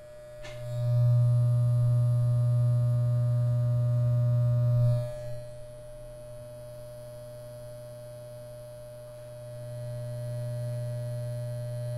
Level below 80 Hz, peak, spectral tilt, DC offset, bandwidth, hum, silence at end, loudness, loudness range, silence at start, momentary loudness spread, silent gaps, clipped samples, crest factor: -52 dBFS; -18 dBFS; -9 dB/octave; under 0.1%; 11.5 kHz; none; 0 s; -28 LUFS; 18 LU; 0 s; 19 LU; none; under 0.1%; 12 dB